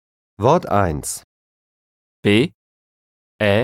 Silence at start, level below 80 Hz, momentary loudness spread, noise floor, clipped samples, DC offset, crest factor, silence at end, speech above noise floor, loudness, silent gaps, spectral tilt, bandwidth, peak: 0.4 s; -44 dBFS; 10 LU; under -90 dBFS; under 0.1%; under 0.1%; 20 dB; 0 s; over 73 dB; -19 LUFS; 1.24-2.23 s, 2.54-3.39 s; -5 dB/octave; 16 kHz; -2 dBFS